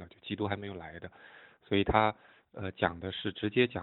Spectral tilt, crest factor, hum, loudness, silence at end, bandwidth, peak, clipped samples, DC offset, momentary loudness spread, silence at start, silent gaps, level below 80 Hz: -9.5 dB/octave; 26 dB; none; -32 LUFS; 0 s; 4.2 kHz; -8 dBFS; under 0.1%; under 0.1%; 21 LU; 0 s; none; -52 dBFS